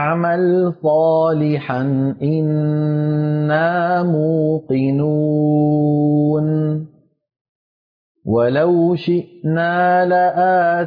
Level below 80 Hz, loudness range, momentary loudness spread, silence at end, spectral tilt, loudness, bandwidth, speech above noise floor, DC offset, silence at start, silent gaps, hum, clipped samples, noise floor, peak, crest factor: -58 dBFS; 3 LU; 5 LU; 0 s; -11 dB/octave; -16 LUFS; 5 kHz; over 74 dB; under 0.1%; 0 s; 7.41-8.15 s; none; under 0.1%; under -90 dBFS; -6 dBFS; 10 dB